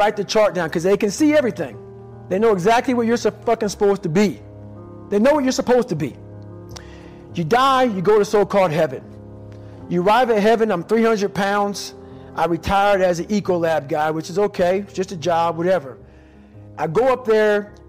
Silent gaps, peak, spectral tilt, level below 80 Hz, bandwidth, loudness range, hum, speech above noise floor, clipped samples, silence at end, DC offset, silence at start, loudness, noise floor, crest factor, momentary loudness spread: none; -8 dBFS; -5.5 dB/octave; -48 dBFS; 16 kHz; 3 LU; none; 27 dB; under 0.1%; 0.15 s; 0.1%; 0 s; -18 LUFS; -45 dBFS; 10 dB; 22 LU